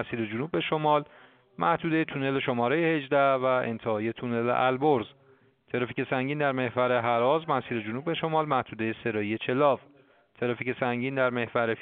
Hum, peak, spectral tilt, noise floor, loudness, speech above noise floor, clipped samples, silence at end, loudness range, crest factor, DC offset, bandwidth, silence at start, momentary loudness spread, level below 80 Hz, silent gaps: none; -10 dBFS; -4.5 dB/octave; -61 dBFS; -27 LUFS; 34 dB; under 0.1%; 0 s; 2 LU; 18 dB; under 0.1%; 4.6 kHz; 0 s; 7 LU; -68 dBFS; none